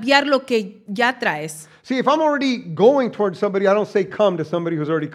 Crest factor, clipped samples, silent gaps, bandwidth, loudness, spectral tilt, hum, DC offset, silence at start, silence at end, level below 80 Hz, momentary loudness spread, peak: 18 dB; under 0.1%; none; 14.5 kHz; -19 LUFS; -5 dB/octave; none; under 0.1%; 0 s; 0 s; -74 dBFS; 8 LU; 0 dBFS